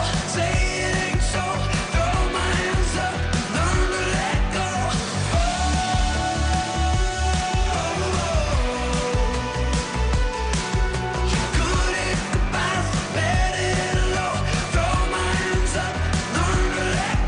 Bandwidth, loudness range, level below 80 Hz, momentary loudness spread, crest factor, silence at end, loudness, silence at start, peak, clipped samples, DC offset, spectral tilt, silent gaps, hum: 10 kHz; 1 LU; -26 dBFS; 2 LU; 14 dB; 0 s; -23 LUFS; 0 s; -8 dBFS; under 0.1%; under 0.1%; -4.5 dB/octave; none; none